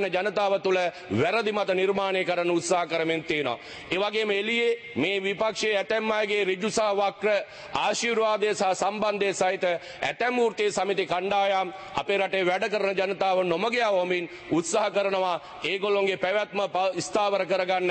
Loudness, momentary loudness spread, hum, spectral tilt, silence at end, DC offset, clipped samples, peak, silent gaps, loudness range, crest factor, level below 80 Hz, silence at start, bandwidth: -26 LUFS; 4 LU; none; -3.5 dB/octave; 0 s; under 0.1%; under 0.1%; -12 dBFS; none; 1 LU; 14 dB; -66 dBFS; 0 s; 8.8 kHz